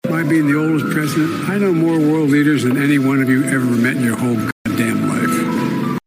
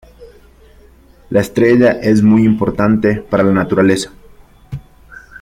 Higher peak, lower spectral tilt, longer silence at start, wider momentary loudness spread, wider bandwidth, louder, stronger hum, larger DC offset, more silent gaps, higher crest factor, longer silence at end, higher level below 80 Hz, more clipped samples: about the same, -2 dBFS vs 0 dBFS; about the same, -6.5 dB/octave vs -7 dB/octave; second, 0.05 s vs 0.2 s; second, 5 LU vs 19 LU; first, 16 kHz vs 14 kHz; second, -16 LUFS vs -13 LUFS; neither; neither; first, 4.52-4.65 s vs none; about the same, 12 dB vs 14 dB; about the same, 0.1 s vs 0.2 s; second, -56 dBFS vs -42 dBFS; neither